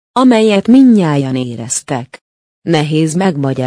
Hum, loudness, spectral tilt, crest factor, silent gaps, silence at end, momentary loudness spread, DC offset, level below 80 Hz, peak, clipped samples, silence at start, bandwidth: none; -12 LUFS; -5.5 dB/octave; 12 dB; 2.21-2.62 s; 0 s; 12 LU; under 0.1%; -54 dBFS; 0 dBFS; under 0.1%; 0.15 s; 10.5 kHz